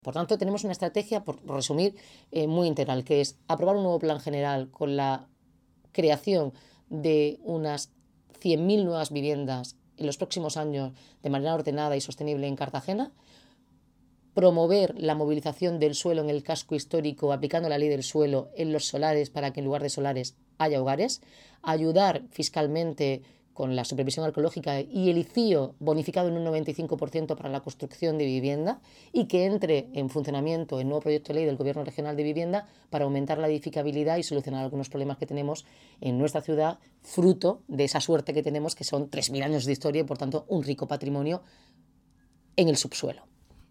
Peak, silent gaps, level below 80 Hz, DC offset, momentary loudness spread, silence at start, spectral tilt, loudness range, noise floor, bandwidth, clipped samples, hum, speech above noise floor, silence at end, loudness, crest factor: -6 dBFS; none; -68 dBFS; under 0.1%; 8 LU; 0.05 s; -5.5 dB/octave; 3 LU; -64 dBFS; 14.5 kHz; under 0.1%; none; 36 dB; 0.5 s; -28 LUFS; 22 dB